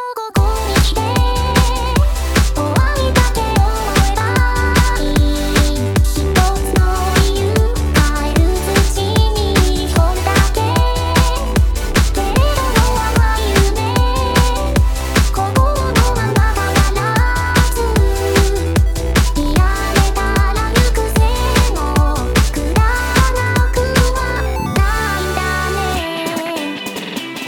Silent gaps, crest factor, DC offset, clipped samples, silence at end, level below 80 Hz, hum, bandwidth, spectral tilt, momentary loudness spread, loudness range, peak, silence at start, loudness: none; 14 dB; under 0.1%; under 0.1%; 0 s; -16 dBFS; none; 18.5 kHz; -5 dB/octave; 3 LU; 1 LU; 0 dBFS; 0 s; -15 LUFS